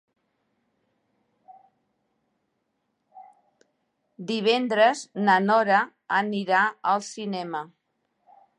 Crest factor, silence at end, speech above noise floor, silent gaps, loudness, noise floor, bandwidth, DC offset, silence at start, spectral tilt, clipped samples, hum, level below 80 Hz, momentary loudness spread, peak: 20 dB; 0.95 s; 53 dB; none; -23 LUFS; -76 dBFS; 11 kHz; under 0.1%; 1.5 s; -4.5 dB/octave; under 0.1%; none; -84 dBFS; 13 LU; -8 dBFS